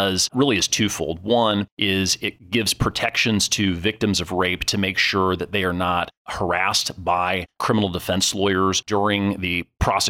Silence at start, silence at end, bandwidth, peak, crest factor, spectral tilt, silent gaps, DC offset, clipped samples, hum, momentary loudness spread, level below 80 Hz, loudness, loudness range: 0 s; 0 s; 17 kHz; -6 dBFS; 16 dB; -3.5 dB/octave; 1.72-1.77 s, 6.17-6.25 s; under 0.1%; under 0.1%; none; 5 LU; -42 dBFS; -21 LUFS; 1 LU